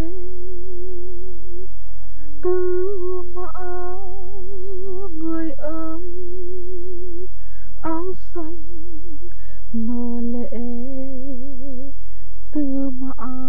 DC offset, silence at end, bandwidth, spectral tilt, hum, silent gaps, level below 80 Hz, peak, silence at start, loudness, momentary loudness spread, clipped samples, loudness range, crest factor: 40%; 0 s; 11.5 kHz; -10 dB/octave; none; none; -40 dBFS; -4 dBFS; 0 s; -29 LUFS; 17 LU; under 0.1%; 4 LU; 16 dB